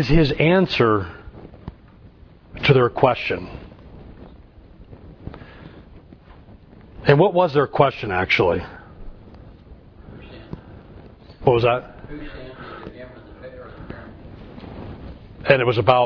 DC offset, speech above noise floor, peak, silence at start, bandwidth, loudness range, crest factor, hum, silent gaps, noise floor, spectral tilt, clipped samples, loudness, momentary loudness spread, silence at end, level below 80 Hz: under 0.1%; 29 dB; 0 dBFS; 0 s; 5.4 kHz; 18 LU; 22 dB; none; none; -46 dBFS; -8 dB/octave; under 0.1%; -18 LUFS; 24 LU; 0 s; -38 dBFS